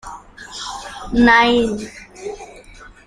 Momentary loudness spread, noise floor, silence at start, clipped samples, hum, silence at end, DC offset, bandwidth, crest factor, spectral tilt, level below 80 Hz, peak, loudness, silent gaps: 24 LU; -41 dBFS; 0.05 s; under 0.1%; none; 0.2 s; under 0.1%; 11 kHz; 18 dB; -4 dB/octave; -40 dBFS; 0 dBFS; -15 LUFS; none